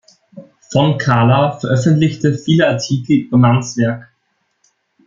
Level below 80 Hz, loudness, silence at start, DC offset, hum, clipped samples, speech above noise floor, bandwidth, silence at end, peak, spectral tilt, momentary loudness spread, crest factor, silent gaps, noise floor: -52 dBFS; -14 LUFS; 0.35 s; under 0.1%; none; under 0.1%; 53 dB; 7.6 kHz; 1.05 s; 0 dBFS; -6.5 dB/octave; 7 LU; 14 dB; none; -66 dBFS